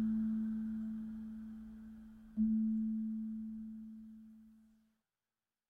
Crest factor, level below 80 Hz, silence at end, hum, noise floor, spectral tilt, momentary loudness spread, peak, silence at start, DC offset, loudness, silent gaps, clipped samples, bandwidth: 14 dB; -66 dBFS; 1.1 s; none; under -90 dBFS; -10 dB/octave; 19 LU; -26 dBFS; 0 s; under 0.1%; -40 LUFS; none; under 0.1%; 1.8 kHz